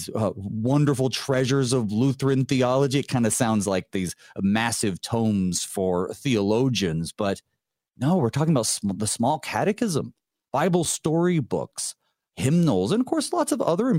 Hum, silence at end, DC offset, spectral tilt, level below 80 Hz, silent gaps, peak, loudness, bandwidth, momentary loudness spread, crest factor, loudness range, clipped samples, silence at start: none; 0 s; under 0.1%; -5.5 dB/octave; -58 dBFS; none; -8 dBFS; -24 LUFS; 16 kHz; 7 LU; 16 dB; 2 LU; under 0.1%; 0 s